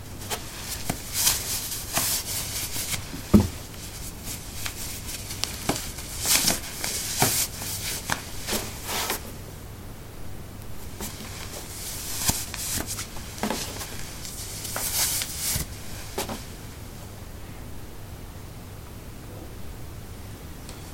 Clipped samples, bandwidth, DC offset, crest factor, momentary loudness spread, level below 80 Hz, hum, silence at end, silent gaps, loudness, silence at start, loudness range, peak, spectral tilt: under 0.1%; 17 kHz; under 0.1%; 28 dB; 19 LU; -42 dBFS; none; 0 s; none; -27 LUFS; 0 s; 13 LU; -2 dBFS; -2.5 dB/octave